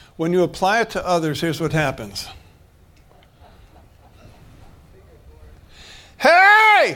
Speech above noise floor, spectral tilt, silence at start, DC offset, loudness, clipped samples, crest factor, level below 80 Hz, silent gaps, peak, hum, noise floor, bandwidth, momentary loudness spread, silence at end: 30 dB; -4.5 dB/octave; 0.2 s; under 0.1%; -16 LUFS; under 0.1%; 18 dB; -48 dBFS; none; -2 dBFS; none; -51 dBFS; 18 kHz; 20 LU; 0 s